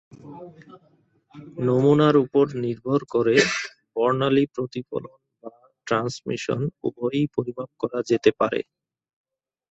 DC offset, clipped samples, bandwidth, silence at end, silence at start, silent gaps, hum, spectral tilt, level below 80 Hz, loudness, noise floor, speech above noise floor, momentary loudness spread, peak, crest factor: under 0.1%; under 0.1%; 8.2 kHz; 1.1 s; 0.25 s; none; none; -6 dB/octave; -62 dBFS; -23 LUFS; -44 dBFS; 22 dB; 21 LU; -4 dBFS; 20 dB